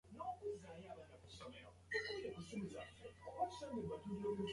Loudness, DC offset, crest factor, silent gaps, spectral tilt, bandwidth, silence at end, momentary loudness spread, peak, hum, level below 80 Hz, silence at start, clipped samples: -48 LUFS; under 0.1%; 18 dB; none; -5.5 dB/octave; 11.5 kHz; 0 s; 13 LU; -30 dBFS; none; -70 dBFS; 0.05 s; under 0.1%